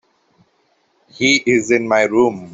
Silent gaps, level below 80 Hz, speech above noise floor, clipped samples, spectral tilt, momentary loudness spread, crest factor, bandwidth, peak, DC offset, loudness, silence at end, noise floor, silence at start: none; -58 dBFS; 46 dB; under 0.1%; -3.5 dB/octave; 3 LU; 16 dB; 7.8 kHz; -2 dBFS; under 0.1%; -15 LUFS; 0 s; -61 dBFS; 1.2 s